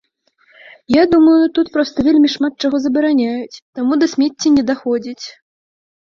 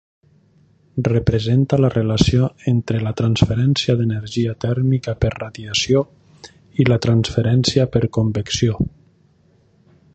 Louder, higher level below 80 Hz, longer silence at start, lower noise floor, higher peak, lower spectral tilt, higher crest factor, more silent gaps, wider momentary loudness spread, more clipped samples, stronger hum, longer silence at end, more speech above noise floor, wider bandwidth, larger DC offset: first, -15 LUFS vs -18 LUFS; second, -50 dBFS vs -38 dBFS; about the same, 0.9 s vs 0.95 s; about the same, -57 dBFS vs -56 dBFS; about the same, -2 dBFS vs 0 dBFS; second, -4.5 dB/octave vs -6 dB/octave; about the same, 14 dB vs 18 dB; first, 3.62-3.73 s vs none; first, 13 LU vs 6 LU; neither; neither; second, 0.8 s vs 1.25 s; first, 43 dB vs 39 dB; second, 7.2 kHz vs 8.4 kHz; neither